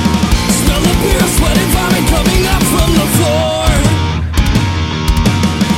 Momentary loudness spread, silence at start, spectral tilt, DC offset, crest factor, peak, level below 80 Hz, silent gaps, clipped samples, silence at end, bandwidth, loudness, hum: 3 LU; 0 s; -4.5 dB/octave; under 0.1%; 10 dB; 0 dBFS; -18 dBFS; none; under 0.1%; 0 s; 16.5 kHz; -12 LUFS; none